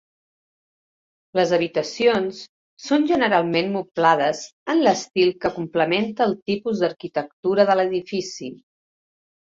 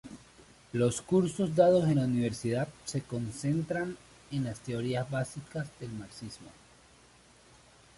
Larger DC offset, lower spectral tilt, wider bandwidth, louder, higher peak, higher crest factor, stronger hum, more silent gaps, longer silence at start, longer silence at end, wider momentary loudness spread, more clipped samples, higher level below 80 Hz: neither; second, -5 dB/octave vs -6.5 dB/octave; second, 7.8 kHz vs 11.5 kHz; first, -21 LUFS vs -31 LUFS; first, -2 dBFS vs -12 dBFS; about the same, 20 dB vs 20 dB; neither; first, 2.49-2.77 s, 4.53-4.66 s, 6.42-6.46 s, 7.33-7.43 s vs none; first, 1.35 s vs 0.05 s; second, 1 s vs 1.45 s; second, 10 LU vs 18 LU; neither; about the same, -64 dBFS vs -62 dBFS